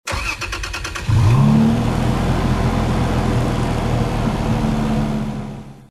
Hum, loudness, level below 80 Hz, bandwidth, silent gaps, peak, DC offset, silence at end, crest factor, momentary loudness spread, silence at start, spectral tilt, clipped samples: none; -18 LUFS; -26 dBFS; 13.5 kHz; none; -4 dBFS; under 0.1%; 0.05 s; 14 dB; 11 LU; 0.05 s; -6.5 dB/octave; under 0.1%